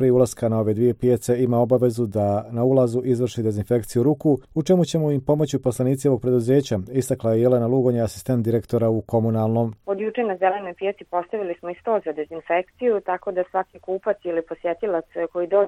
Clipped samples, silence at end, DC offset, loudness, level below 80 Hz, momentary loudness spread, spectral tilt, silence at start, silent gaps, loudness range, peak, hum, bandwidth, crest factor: under 0.1%; 0 s; under 0.1%; -22 LUFS; -54 dBFS; 8 LU; -7.5 dB/octave; 0 s; none; 5 LU; -6 dBFS; none; 15 kHz; 16 dB